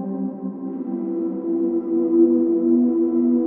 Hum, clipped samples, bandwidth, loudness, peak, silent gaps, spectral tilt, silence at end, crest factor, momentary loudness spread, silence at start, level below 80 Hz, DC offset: none; under 0.1%; 1.7 kHz; -21 LUFS; -6 dBFS; none; -14 dB/octave; 0 s; 14 dB; 11 LU; 0 s; -70 dBFS; under 0.1%